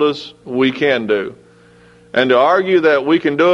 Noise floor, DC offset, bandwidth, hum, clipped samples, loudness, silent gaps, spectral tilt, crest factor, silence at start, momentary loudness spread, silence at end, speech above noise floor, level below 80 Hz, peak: -46 dBFS; under 0.1%; 7.8 kHz; none; under 0.1%; -15 LUFS; none; -6 dB/octave; 16 dB; 0 s; 10 LU; 0 s; 32 dB; -58 dBFS; 0 dBFS